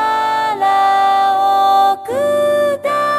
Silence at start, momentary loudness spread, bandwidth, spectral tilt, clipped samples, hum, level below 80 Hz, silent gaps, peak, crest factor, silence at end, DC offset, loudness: 0 s; 5 LU; 15 kHz; -3 dB/octave; under 0.1%; none; -68 dBFS; none; -2 dBFS; 10 dB; 0 s; under 0.1%; -14 LUFS